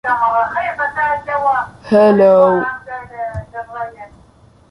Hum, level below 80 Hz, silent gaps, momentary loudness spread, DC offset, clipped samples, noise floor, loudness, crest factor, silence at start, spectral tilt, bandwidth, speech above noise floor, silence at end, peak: none; -46 dBFS; none; 18 LU; under 0.1%; under 0.1%; -47 dBFS; -14 LUFS; 14 dB; 0.05 s; -7.5 dB/octave; 10.5 kHz; 33 dB; 0.65 s; -2 dBFS